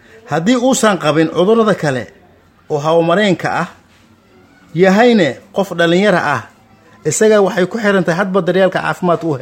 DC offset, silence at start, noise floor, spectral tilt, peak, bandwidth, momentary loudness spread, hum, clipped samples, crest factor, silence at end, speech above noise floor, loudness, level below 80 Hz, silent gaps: under 0.1%; 0.25 s; -48 dBFS; -5 dB/octave; 0 dBFS; 16.5 kHz; 10 LU; none; under 0.1%; 14 dB; 0 s; 35 dB; -13 LUFS; -56 dBFS; none